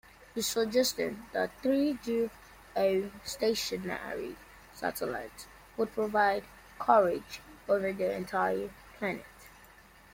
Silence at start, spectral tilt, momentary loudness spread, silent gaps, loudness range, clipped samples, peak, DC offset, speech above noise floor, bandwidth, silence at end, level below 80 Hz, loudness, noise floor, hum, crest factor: 0.35 s; -3.5 dB/octave; 16 LU; none; 4 LU; under 0.1%; -10 dBFS; under 0.1%; 26 dB; 16.5 kHz; 0.5 s; -62 dBFS; -31 LUFS; -56 dBFS; none; 22 dB